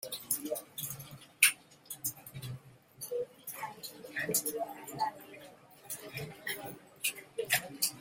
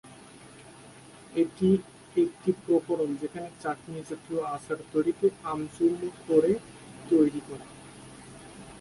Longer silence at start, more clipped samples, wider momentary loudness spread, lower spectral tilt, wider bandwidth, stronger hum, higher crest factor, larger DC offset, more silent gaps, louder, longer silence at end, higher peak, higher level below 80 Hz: about the same, 0 s vs 0.05 s; neither; second, 18 LU vs 25 LU; second, -1.5 dB/octave vs -7 dB/octave; first, 16.5 kHz vs 11.5 kHz; neither; first, 34 dB vs 20 dB; neither; neither; second, -35 LUFS vs -28 LUFS; about the same, 0 s vs 0 s; first, -4 dBFS vs -10 dBFS; second, -74 dBFS vs -62 dBFS